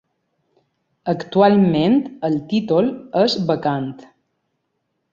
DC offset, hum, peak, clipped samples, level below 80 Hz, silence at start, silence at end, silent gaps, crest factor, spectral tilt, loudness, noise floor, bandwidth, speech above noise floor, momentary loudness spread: under 0.1%; none; -2 dBFS; under 0.1%; -60 dBFS; 1.05 s; 1.1 s; none; 18 dB; -7.5 dB/octave; -18 LUFS; -73 dBFS; 7.4 kHz; 55 dB; 11 LU